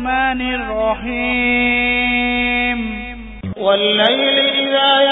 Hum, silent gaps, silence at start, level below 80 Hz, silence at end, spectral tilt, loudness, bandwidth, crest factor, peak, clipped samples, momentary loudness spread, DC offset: none; none; 0 s; -36 dBFS; 0 s; -7 dB/octave; -15 LUFS; 4 kHz; 16 dB; 0 dBFS; under 0.1%; 10 LU; under 0.1%